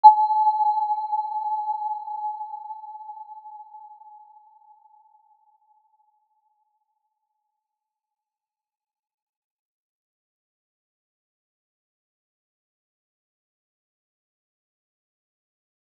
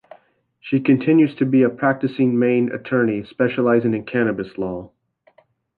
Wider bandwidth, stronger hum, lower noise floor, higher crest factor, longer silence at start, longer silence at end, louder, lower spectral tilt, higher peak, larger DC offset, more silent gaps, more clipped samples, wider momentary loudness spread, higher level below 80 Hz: about the same, 4.3 kHz vs 4.6 kHz; neither; first, under -90 dBFS vs -57 dBFS; first, 28 dB vs 16 dB; second, 0.05 s vs 0.65 s; first, 12.05 s vs 0.9 s; second, -24 LUFS vs -19 LUFS; second, -1 dB/octave vs -10.5 dB/octave; about the same, -2 dBFS vs -4 dBFS; neither; neither; neither; first, 23 LU vs 10 LU; second, under -90 dBFS vs -58 dBFS